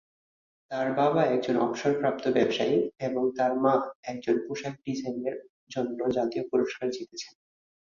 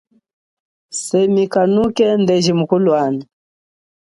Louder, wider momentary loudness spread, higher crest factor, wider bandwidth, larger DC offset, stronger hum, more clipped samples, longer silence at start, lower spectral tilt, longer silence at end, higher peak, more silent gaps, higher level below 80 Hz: second, -28 LUFS vs -15 LUFS; about the same, 11 LU vs 9 LU; first, 20 dB vs 14 dB; second, 7.4 kHz vs 11.5 kHz; neither; neither; neither; second, 0.7 s vs 0.9 s; about the same, -6 dB/octave vs -5.5 dB/octave; second, 0.6 s vs 0.9 s; second, -10 dBFS vs -2 dBFS; first, 3.95-4.03 s, 5.49-5.67 s vs none; second, -68 dBFS vs -56 dBFS